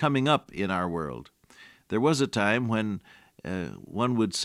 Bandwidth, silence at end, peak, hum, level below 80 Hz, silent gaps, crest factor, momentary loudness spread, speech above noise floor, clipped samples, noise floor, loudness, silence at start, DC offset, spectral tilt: 15 kHz; 0 s; -10 dBFS; none; -62 dBFS; none; 18 dB; 12 LU; 27 dB; under 0.1%; -54 dBFS; -27 LUFS; 0 s; under 0.1%; -5.5 dB/octave